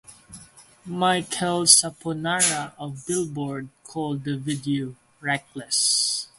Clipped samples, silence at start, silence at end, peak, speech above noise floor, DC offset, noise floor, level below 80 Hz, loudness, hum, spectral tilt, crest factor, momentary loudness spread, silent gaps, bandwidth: under 0.1%; 0.1 s; 0.15 s; 0 dBFS; 25 dB; under 0.1%; -49 dBFS; -64 dBFS; -22 LUFS; none; -2.5 dB/octave; 26 dB; 18 LU; none; 16 kHz